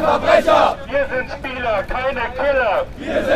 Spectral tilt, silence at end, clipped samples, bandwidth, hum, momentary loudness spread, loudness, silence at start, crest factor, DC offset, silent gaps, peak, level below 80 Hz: -5 dB/octave; 0 s; under 0.1%; 14.5 kHz; none; 9 LU; -18 LUFS; 0 s; 16 dB; under 0.1%; none; 0 dBFS; -36 dBFS